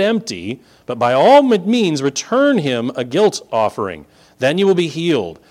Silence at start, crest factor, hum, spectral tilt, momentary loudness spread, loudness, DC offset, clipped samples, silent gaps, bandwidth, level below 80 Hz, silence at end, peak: 0 s; 14 dB; none; -5 dB/octave; 16 LU; -16 LUFS; under 0.1%; under 0.1%; none; 14 kHz; -58 dBFS; 0.2 s; 0 dBFS